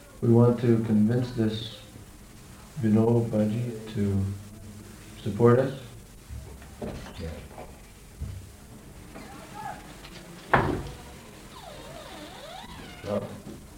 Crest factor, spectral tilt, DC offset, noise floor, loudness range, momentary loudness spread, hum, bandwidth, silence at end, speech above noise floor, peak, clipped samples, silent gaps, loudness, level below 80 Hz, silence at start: 22 dB; -7.5 dB/octave; under 0.1%; -47 dBFS; 15 LU; 24 LU; none; 16 kHz; 0 s; 23 dB; -6 dBFS; under 0.1%; none; -26 LUFS; -48 dBFS; 0 s